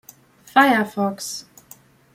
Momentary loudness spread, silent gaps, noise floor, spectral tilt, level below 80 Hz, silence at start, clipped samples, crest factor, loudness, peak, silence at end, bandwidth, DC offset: 15 LU; none; -49 dBFS; -4 dB/octave; -68 dBFS; 0.55 s; under 0.1%; 20 dB; -19 LUFS; -2 dBFS; 0.75 s; 16.5 kHz; under 0.1%